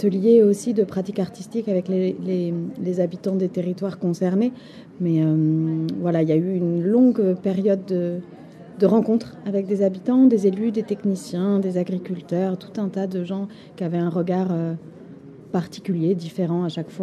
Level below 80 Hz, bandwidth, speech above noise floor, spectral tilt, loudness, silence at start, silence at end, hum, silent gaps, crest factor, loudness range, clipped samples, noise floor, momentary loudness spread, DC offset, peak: -68 dBFS; 12 kHz; 21 dB; -8.5 dB/octave; -22 LUFS; 0 s; 0 s; none; none; 16 dB; 5 LU; under 0.1%; -42 dBFS; 11 LU; under 0.1%; -6 dBFS